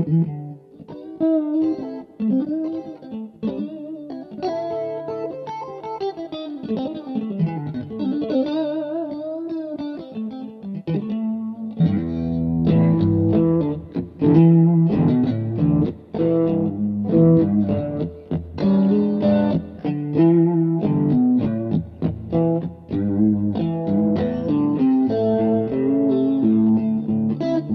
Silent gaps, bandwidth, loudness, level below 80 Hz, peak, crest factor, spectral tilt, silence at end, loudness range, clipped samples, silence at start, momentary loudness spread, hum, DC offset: none; 5.2 kHz; -21 LUFS; -48 dBFS; -4 dBFS; 16 dB; -11 dB/octave; 0 s; 10 LU; under 0.1%; 0 s; 14 LU; none; under 0.1%